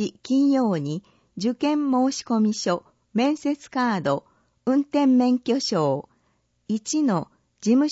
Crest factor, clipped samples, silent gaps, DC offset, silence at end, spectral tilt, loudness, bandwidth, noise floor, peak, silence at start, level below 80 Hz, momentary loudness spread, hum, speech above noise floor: 14 dB; under 0.1%; none; under 0.1%; 0 s; -5.5 dB/octave; -23 LUFS; 8 kHz; -68 dBFS; -8 dBFS; 0 s; -70 dBFS; 10 LU; none; 46 dB